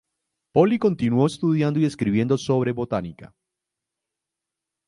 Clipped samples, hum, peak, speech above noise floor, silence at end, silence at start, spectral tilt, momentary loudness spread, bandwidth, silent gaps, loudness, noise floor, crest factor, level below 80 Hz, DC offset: under 0.1%; none; -2 dBFS; 64 dB; 1.6 s; 0.55 s; -7.5 dB/octave; 7 LU; 11.5 kHz; none; -22 LUFS; -85 dBFS; 20 dB; -56 dBFS; under 0.1%